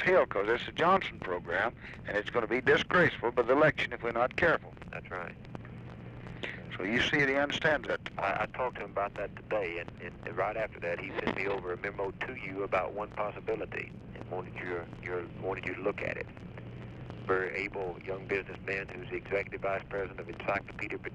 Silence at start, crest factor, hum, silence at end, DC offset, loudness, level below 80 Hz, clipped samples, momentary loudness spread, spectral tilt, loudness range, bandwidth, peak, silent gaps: 0 s; 20 dB; none; 0 s; under 0.1%; -32 LUFS; -56 dBFS; under 0.1%; 16 LU; -6 dB/octave; 8 LU; 9.8 kHz; -14 dBFS; none